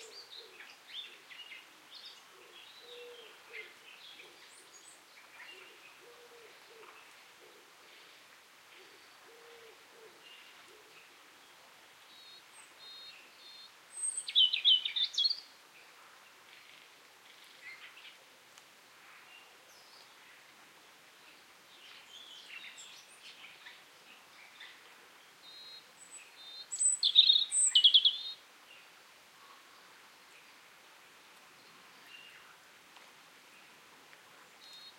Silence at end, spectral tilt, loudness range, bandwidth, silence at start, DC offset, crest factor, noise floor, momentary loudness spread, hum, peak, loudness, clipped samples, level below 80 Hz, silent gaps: 0.1 s; 3.5 dB/octave; 28 LU; 16.5 kHz; 0 s; under 0.1%; 30 dB; -59 dBFS; 30 LU; none; -10 dBFS; -26 LUFS; under 0.1%; under -90 dBFS; none